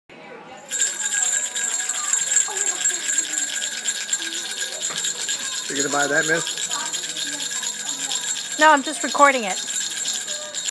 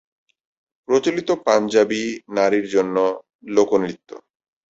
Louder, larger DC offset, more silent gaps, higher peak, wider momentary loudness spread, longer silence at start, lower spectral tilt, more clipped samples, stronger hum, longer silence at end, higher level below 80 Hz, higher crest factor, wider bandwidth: about the same, -21 LUFS vs -20 LUFS; neither; second, none vs 3.35-3.39 s; about the same, -2 dBFS vs -2 dBFS; about the same, 9 LU vs 7 LU; second, 0.1 s vs 0.9 s; second, 0 dB/octave vs -4.5 dB/octave; neither; neither; second, 0 s vs 0.55 s; second, -80 dBFS vs -64 dBFS; about the same, 22 dB vs 18 dB; first, 11 kHz vs 8 kHz